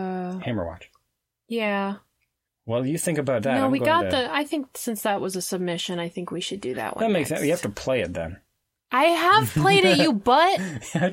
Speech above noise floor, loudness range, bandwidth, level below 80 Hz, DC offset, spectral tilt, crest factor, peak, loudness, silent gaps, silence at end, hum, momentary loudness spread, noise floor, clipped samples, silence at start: 55 dB; 7 LU; 16.5 kHz; -58 dBFS; under 0.1%; -4.5 dB/octave; 18 dB; -4 dBFS; -23 LUFS; none; 0 s; none; 12 LU; -78 dBFS; under 0.1%; 0 s